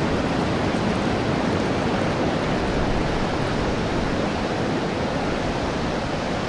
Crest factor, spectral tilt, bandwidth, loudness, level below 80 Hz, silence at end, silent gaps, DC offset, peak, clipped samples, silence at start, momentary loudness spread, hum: 14 dB; -6 dB/octave; 11.5 kHz; -23 LUFS; -36 dBFS; 0 s; none; under 0.1%; -10 dBFS; under 0.1%; 0 s; 2 LU; none